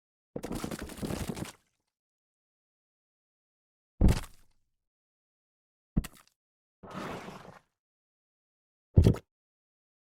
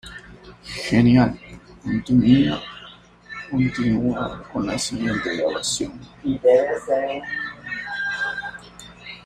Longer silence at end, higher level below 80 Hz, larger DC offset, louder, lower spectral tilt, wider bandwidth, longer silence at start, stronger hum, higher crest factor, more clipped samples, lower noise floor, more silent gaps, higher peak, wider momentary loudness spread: first, 1 s vs 0.05 s; first, -40 dBFS vs -46 dBFS; neither; second, -32 LUFS vs -21 LUFS; first, -7 dB/octave vs -5.5 dB/octave; first, 16.5 kHz vs 13 kHz; first, 0.35 s vs 0.05 s; neither; first, 26 dB vs 18 dB; neither; first, -64 dBFS vs -45 dBFS; first, 1.99-3.98 s, 4.87-5.96 s, 6.36-6.83 s, 7.79-8.94 s vs none; second, -8 dBFS vs -4 dBFS; about the same, 21 LU vs 21 LU